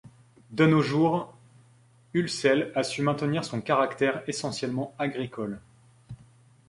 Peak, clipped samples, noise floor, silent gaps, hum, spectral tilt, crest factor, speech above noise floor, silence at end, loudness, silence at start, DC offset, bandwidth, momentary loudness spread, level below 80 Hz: -8 dBFS; under 0.1%; -59 dBFS; none; none; -5.5 dB/octave; 20 dB; 33 dB; 0.55 s; -27 LUFS; 0.5 s; under 0.1%; 11.5 kHz; 19 LU; -64 dBFS